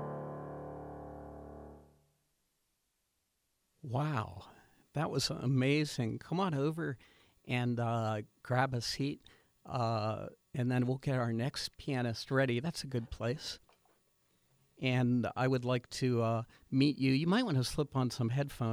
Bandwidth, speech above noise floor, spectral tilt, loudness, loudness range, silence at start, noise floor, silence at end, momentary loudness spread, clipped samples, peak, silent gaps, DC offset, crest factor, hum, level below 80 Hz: 14.5 kHz; 48 dB; -6 dB/octave; -35 LUFS; 11 LU; 0 s; -81 dBFS; 0 s; 15 LU; under 0.1%; -16 dBFS; none; under 0.1%; 20 dB; none; -62 dBFS